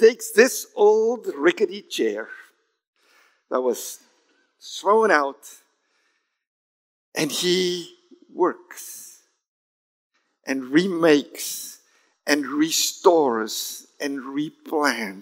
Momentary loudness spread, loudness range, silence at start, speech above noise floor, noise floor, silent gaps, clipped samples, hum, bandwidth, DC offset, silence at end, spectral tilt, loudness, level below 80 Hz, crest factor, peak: 19 LU; 6 LU; 0 s; 49 dB; -70 dBFS; 2.87-2.93 s, 6.47-7.12 s, 9.48-10.10 s; under 0.1%; none; 16 kHz; under 0.1%; 0 s; -3 dB/octave; -22 LUFS; -88 dBFS; 22 dB; 0 dBFS